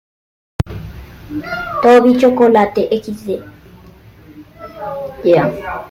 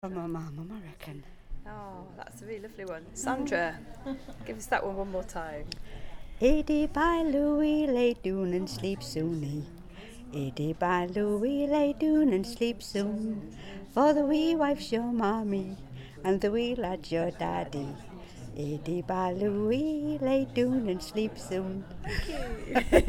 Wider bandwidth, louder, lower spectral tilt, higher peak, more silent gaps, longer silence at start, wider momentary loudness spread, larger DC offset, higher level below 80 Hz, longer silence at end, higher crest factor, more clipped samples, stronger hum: second, 15.5 kHz vs 17.5 kHz; first, -14 LUFS vs -30 LUFS; about the same, -7 dB/octave vs -6 dB/octave; first, -2 dBFS vs -6 dBFS; neither; first, 0.6 s vs 0.05 s; first, 23 LU vs 18 LU; neither; about the same, -40 dBFS vs -44 dBFS; about the same, 0 s vs 0 s; second, 14 dB vs 24 dB; neither; neither